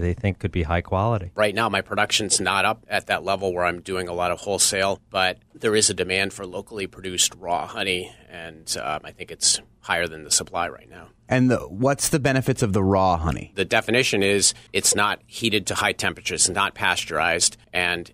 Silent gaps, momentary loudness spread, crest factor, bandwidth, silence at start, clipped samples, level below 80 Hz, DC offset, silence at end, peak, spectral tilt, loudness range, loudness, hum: none; 9 LU; 18 dB; 15.5 kHz; 0 s; under 0.1%; -44 dBFS; under 0.1%; 0.05 s; -4 dBFS; -3 dB/octave; 4 LU; -22 LUFS; none